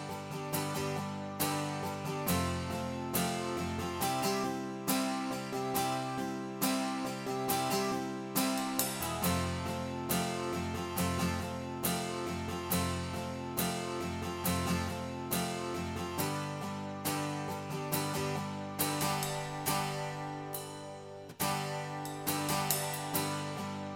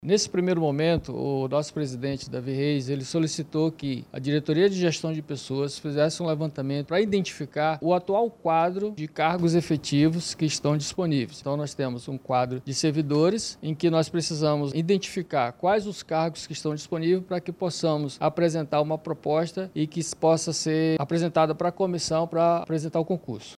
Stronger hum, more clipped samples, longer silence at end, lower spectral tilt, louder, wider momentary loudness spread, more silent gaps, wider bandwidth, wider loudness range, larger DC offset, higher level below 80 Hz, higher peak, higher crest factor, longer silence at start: neither; neither; about the same, 0 s vs 0 s; second, -4 dB/octave vs -5.5 dB/octave; second, -35 LUFS vs -26 LUFS; about the same, 7 LU vs 8 LU; neither; first, 18 kHz vs 12.5 kHz; about the same, 2 LU vs 2 LU; neither; about the same, -58 dBFS vs -60 dBFS; second, -12 dBFS vs -8 dBFS; first, 22 dB vs 16 dB; about the same, 0 s vs 0 s